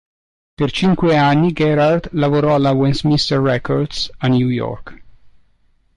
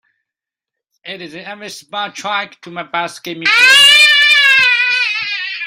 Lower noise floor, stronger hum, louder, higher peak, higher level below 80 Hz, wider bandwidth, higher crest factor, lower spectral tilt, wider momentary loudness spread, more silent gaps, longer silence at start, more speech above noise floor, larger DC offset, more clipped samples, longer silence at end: second, -56 dBFS vs -85 dBFS; neither; second, -16 LUFS vs -9 LUFS; second, -6 dBFS vs 0 dBFS; first, -40 dBFS vs -68 dBFS; second, 10.5 kHz vs 16 kHz; about the same, 10 dB vs 14 dB; first, -7 dB/octave vs 0.5 dB/octave; second, 8 LU vs 24 LU; neither; second, 0.6 s vs 1.05 s; second, 41 dB vs 72 dB; neither; neither; first, 0.7 s vs 0 s